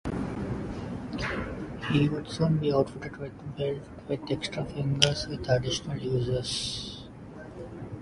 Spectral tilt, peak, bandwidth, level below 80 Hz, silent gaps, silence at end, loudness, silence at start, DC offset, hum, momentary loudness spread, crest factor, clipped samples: -5 dB/octave; -2 dBFS; 11.5 kHz; -48 dBFS; none; 0 s; -30 LUFS; 0.05 s; under 0.1%; none; 15 LU; 30 dB; under 0.1%